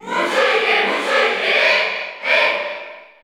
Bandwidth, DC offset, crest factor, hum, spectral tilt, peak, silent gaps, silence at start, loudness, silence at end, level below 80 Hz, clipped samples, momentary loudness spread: 18 kHz; under 0.1%; 14 dB; none; -1.5 dB/octave; -4 dBFS; none; 0 s; -16 LUFS; 0.2 s; -72 dBFS; under 0.1%; 10 LU